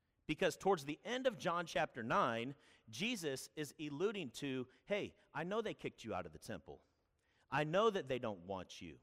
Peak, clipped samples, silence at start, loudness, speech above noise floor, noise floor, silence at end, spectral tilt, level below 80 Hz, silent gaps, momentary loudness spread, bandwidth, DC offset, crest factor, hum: -22 dBFS; under 0.1%; 0.3 s; -41 LUFS; 39 dB; -80 dBFS; 0.05 s; -4.5 dB/octave; -72 dBFS; none; 13 LU; 15.5 kHz; under 0.1%; 18 dB; none